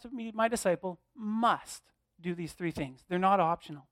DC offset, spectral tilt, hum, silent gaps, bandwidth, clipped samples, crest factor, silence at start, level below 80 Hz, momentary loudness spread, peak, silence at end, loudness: under 0.1%; -5 dB/octave; none; none; 16 kHz; under 0.1%; 18 dB; 0.05 s; -64 dBFS; 14 LU; -14 dBFS; 0.1 s; -32 LUFS